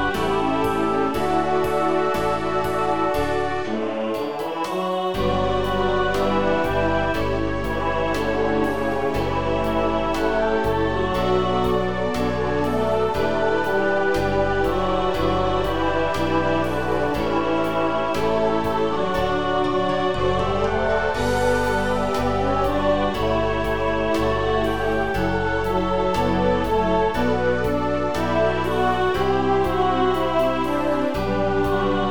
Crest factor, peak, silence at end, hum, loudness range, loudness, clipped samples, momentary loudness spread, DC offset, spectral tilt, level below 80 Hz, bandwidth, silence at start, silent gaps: 14 dB; -6 dBFS; 0 s; none; 2 LU; -22 LUFS; under 0.1%; 3 LU; 2%; -6 dB/octave; -36 dBFS; 19 kHz; 0 s; none